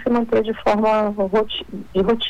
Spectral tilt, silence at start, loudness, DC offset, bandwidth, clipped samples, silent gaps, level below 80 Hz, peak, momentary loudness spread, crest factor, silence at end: -6.5 dB/octave; 0 s; -20 LUFS; under 0.1%; 9.6 kHz; under 0.1%; none; -44 dBFS; -10 dBFS; 8 LU; 10 dB; 0 s